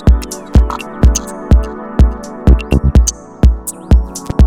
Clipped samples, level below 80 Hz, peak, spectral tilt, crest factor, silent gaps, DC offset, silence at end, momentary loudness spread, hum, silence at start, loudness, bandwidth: under 0.1%; -12 dBFS; 0 dBFS; -6 dB/octave; 10 dB; none; 0.5%; 0 s; 7 LU; none; 0 s; -14 LUFS; 15 kHz